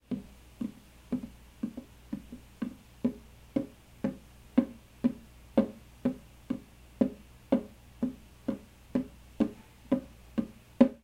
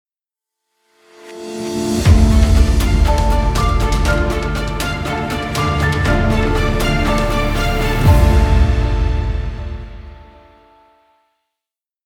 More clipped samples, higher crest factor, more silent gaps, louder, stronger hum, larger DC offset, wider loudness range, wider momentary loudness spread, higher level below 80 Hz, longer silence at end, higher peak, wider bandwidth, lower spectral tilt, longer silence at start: neither; first, 28 dB vs 16 dB; neither; second, -35 LUFS vs -16 LUFS; neither; neither; about the same, 5 LU vs 3 LU; first, 17 LU vs 14 LU; second, -56 dBFS vs -18 dBFS; second, 0.05 s vs 1.85 s; second, -6 dBFS vs 0 dBFS; about the same, 15.5 kHz vs 17 kHz; first, -8 dB/octave vs -6 dB/octave; second, 0.1 s vs 1.25 s